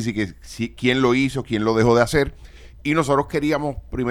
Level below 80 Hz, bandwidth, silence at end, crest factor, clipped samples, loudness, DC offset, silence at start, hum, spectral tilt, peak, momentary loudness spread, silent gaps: -40 dBFS; 19 kHz; 0 s; 18 dB; under 0.1%; -21 LUFS; under 0.1%; 0 s; none; -6 dB/octave; -2 dBFS; 12 LU; none